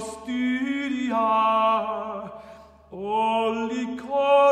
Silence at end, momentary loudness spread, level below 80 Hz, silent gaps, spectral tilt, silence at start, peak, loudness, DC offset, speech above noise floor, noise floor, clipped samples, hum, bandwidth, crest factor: 0 s; 16 LU; -60 dBFS; none; -4.5 dB/octave; 0 s; -8 dBFS; -24 LUFS; under 0.1%; 25 dB; -47 dBFS; under 0.1%; none; 11 kHz; 16 dB